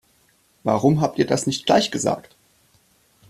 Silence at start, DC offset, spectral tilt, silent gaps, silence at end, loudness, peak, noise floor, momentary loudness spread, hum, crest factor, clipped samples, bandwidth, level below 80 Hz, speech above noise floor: 0.65 s; under 0.1%; -5 dB/octave; none; 1.1 s; -21 LUFS; -4 dBFS; -61 dBFS; 7 LU; none; 20 dB; under 0.1%; 14 kHz; -58 dBFS; 41 dB